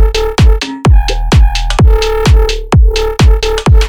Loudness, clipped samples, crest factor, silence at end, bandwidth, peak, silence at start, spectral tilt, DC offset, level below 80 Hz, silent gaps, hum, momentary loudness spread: -10 LUFS; under 0.1%; 8 dB; 0 s; 11.5 kHz; 0 dBFS; 0 s; -5.5 dB/octave; under 0.1%; -10 dBFS; none; none; 2 LU